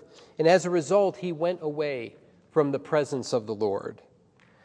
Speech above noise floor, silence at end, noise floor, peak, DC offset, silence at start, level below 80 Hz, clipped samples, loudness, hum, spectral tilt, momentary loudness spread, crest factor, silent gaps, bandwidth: 34 dB; 0.7 s; -60 dBFS; -8 dBFS; under 0.1%; 0.4 s; -74 dBFS; under 0.1%; -26 LUFS; none; -5.5 dB/octave; 13 LU; 18 dB; none; 10.5 kHz